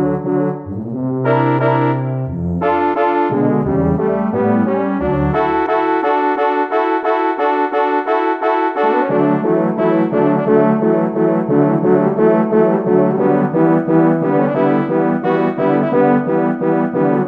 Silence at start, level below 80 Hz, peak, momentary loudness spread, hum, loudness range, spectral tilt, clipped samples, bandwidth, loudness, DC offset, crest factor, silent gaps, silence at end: 0 s; -42 dBFS; 0 dBFS; 4 LU; none; 2 LU; -10 dB/octave; under 0.1%; 5.4 kHz; -15 LUFS; under 0.1%; 14 dB; none; 0 s